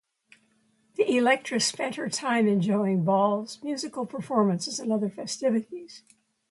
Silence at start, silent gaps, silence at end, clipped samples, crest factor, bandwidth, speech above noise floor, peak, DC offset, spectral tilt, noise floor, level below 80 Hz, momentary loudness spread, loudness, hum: 1 s; none; 0.55 s; under 0.1%; 18 dB; 11.5 kHz; 41 dB; -10 dBFS; under 0.1%; -4.5 dB/octave; -67 dBFS; -74 dBFS; 10 LU; -26 LUFS; none